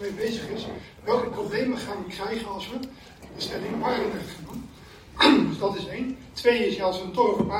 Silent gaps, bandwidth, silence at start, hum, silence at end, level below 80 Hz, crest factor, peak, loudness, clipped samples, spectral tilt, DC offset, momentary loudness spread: none; 16 kHz; 0 s; none; 0 s; -52 dBFS; 22 dB; -4 dBFS; -26 LUFS; under 0.1%; -5 dB/octave; under 0.1%; 17 LU